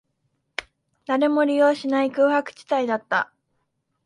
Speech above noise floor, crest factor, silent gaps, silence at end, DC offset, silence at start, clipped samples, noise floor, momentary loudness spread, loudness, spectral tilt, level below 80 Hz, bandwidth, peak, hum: 53 dB; 18 dB; none; 0.8 s; under 0.1%; 0.6 s; under 0.1%; -74 dBFS; 15 LU; -22 LUFS; -4.5 dB/octave; -70 dBFS; 11 kHz; -6 dBFS; none